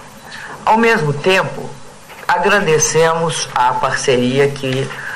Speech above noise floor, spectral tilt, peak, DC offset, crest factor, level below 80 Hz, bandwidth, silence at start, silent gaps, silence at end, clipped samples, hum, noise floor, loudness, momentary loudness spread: 20 dB; -3.5 dB/octave; -4 dBFS; under 0.1%; 12 dB; -46 dBFS; 16 kHz; 0 s; none; 0 s; under 0.1%; none; -35 dBFS; -14 LUFS; 16 LU